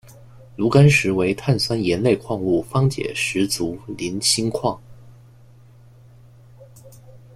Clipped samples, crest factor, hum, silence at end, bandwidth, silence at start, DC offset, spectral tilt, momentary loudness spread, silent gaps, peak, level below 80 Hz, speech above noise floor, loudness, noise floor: under 0.1%; 18 dB; none; 0.2 s; 14.5 kHz; 0.2 s; under 0.1%; -5 dB/octave; 12 LU; none; -2 dBFS; -50 dBFS; 28 dB; -20 LUFS; -47 dBFS